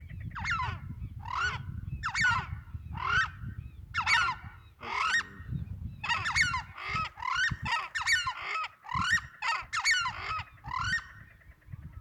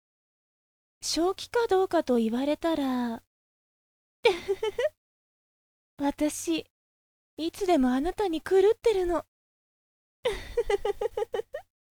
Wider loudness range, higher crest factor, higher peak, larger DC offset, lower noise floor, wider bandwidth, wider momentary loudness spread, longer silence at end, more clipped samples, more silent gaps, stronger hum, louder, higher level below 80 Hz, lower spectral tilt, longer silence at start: second, 2 LU vs 5 LU; about the same, 20 dB vs 20 dB; second, -12 dBFS vs -8 dBFS; neither; second, -54 dBFS vs under -90 dBFS; about the same, 20 kHz vs over 20 kHz; first, 16 LU vs 10 LU; second, 0 s vs 0.4 s; neither; second, none vs 3.27-4.23 s, 4.97-5.97 s, 6.70-7.37 s, 9.28-10.23 s; neither; second, -31 LUFS vs -28 LUFS; about the same, -50 dBFS vs -50 dBFS; second, -2 dB/octave vs -3.5 dB/octave; second, 0 s vs 1 s